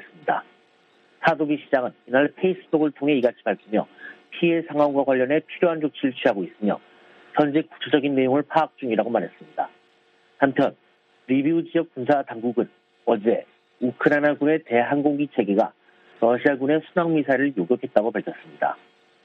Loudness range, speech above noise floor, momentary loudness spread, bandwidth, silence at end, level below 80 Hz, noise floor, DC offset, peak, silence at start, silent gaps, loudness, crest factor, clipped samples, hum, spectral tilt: 3 LU; 38 dB; 8 LU; 5.6 kHz; 0.5 s; -70 dBFS; -60 dBFS; under 0.1%; -2 dBFS; 0.25 s; none; -23 LUFS; 22 dB; under 0.1%; none; -8.5 dB/octave